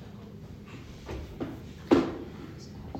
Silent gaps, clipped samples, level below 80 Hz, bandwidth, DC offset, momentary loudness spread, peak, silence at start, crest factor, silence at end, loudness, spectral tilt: none; under 0.1%; -50 dBFS; 16 kHz; under 0.1%; 20 LU; -8 dBFS; 0 s; 26 dB; 0 s; -31 LUFS; -7 dB/octave